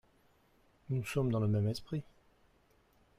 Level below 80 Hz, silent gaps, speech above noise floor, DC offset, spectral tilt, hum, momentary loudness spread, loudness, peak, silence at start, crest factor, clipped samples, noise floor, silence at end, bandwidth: -64 dBFS; none; 36 dB; under 0.1%; -7.5 dB/octave; none; 10 LU; -35 LUFS; -22 dBFS; 0.9 s; 16 dB; under 0.1%; -69 dBFS; 1.15 s; 14.5 kHz